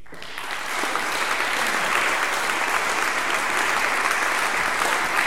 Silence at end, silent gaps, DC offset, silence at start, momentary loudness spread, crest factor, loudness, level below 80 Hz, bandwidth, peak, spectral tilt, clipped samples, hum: 0 s; none; 2%; 0.1 s; 5 LU; 20 dB; -22 LUFS; -54 dBFS; 18 kHz; -4 dBFS; -0.5 dB/octave; under 0.1%; none